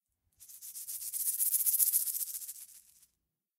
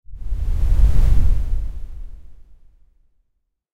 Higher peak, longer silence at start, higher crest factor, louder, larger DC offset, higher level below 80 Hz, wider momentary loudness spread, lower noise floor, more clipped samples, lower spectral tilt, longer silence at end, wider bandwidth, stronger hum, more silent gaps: second, -10 dBFS vs -2 dBFS; first, 0.4 s vs 0.1 s; first, 26 dB vs 14 dB; second, -30 LUFS vs -22 LUFS; neither; second, -86 dBFS vs -20 dBFS; about the same, 21 LU vs 21 LU; first, -84 dBFS vs -71 dBFS; neither; second, 5 dB/octave vs -7.5 dB/octave; second, 0.8 s vs 1.4 s; first, 17 kHz vs 4.3 kHz; neither; neither